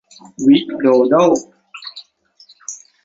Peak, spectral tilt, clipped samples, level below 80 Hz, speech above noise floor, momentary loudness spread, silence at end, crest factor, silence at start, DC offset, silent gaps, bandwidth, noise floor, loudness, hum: -2 dBFS; -5 dB/octave; under 0.1%; -60 dBFS; 37 dB; 21 LU; 0.3 s; 16 dB; 0.4 s; under 0.1%; none; 7.8 kHz; -50 dBFS; -14 LUFS; none